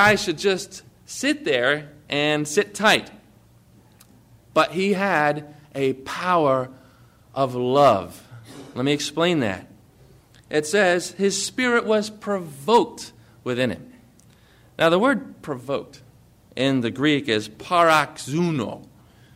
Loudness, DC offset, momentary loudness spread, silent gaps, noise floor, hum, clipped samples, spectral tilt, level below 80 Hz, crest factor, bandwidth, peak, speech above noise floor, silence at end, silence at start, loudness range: -22 LUFS; under 0.1%; 17 LU; none; -53 dBFS; none; under 0.1%; -4 dB/octave; -60 dBFS; 18 dB; 16 kHz; -4 dBFS; 32 dB; 0.55 s; 0 s; 3 LU